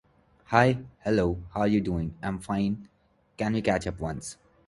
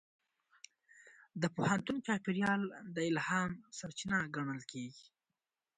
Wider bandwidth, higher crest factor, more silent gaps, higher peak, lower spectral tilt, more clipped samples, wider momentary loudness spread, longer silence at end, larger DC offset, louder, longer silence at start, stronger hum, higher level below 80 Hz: first, 11.5 kHz vs 9.4 kHz; about the same, 24 dB vs 20 dB; neither; first, -4 dBFS vs -18 dBFS; first, -6.5 dB/octave vs -5 dB/octave; neither; about the same, 12 LU vs 12 LU; second, 0.35 s vs 0.75 s; neither; first, -28 LUFS vs -37 LUFS; second, 0.5 s vs 0.95 s; neither; first, -46 dBFS vs -72 dBFS